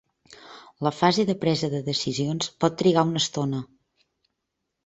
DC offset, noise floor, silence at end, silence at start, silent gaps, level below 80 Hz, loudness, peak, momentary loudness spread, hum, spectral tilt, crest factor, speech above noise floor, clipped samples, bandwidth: under 0.1%; -81 dBFS; 1.2 s; 0.3 s; none; -62 dBFS; -24 LUFS; -4 dBFS; 11 LU; none; -5 dB/octave; 22 dB; 57 dB; under 0.1%; 8.2 kHz